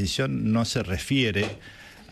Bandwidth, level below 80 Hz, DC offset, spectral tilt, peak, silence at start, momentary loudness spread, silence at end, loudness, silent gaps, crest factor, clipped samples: 13 kHz; -48 dBFS; under 0.1%; -5 dB/octave; -12 dBFS; 0 s; 19 LU; 0 s; -25 LUFS; none; 14 dB; under 0.1%